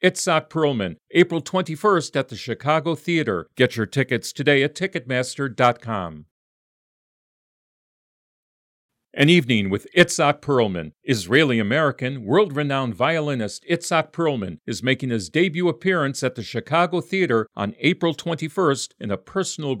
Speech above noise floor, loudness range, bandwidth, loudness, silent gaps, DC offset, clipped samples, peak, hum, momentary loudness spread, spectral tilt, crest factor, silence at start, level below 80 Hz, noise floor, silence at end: over 69 dB; 5 LU; 16 kHz; -21 LUFS; 6.31-8.89 s; under 0.1%; under 0.1%; -2 dBFS; none; 9 LU; -5 dB/octave; 20 dB; 0 s; -64 dBFS; under -90 dBFS; 0 s